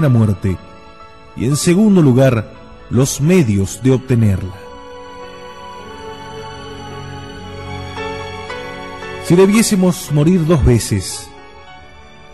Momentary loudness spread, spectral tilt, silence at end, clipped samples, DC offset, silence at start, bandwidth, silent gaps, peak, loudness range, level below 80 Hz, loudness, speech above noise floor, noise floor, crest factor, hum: 22 LU; -6 dB/octave; 0.55 s; under 0.1%; 0.7%; 0 s; 13 kHz; none; -2 dBFS; 15 LU; -34 dBFS; -14 LUFS; 27 dB; -40 dBFS; 14 dB; none